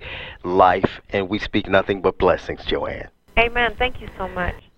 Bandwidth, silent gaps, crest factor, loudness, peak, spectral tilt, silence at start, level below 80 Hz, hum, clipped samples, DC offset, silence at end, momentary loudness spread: 8.2 kHz; none; 20 dB; -21 LUFS; 0 dBFS; -6.5 dB/octave; 0 s; -36 dBFS; none; under 0.1%; under 0.1%; 0.15 s; 13 LU